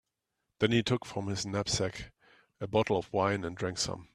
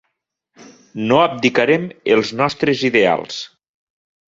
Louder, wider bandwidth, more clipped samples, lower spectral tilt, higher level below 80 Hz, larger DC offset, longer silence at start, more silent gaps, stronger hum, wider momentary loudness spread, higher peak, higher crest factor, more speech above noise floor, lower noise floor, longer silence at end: second, -32 LUFS vs -16 LUFS; first, 13.5 kHz vs 7.8 kHz; neither; about the same, -4.5 dB/octave vs -5 dB/octave; about the same, -58 dBFS vs -58 dBFS; neither; second, 0.6 s vs 0.95 s; neither; neither; second, 8 LU vs 14 LU; second, -10 dBFS vs 0 dBFS; about the same, 22 dB vs 18 dB; second, 53 dB vs 57 dB; first, -84 dBFS vs -74 dBFS; second, 0.1 s vs 0.85 s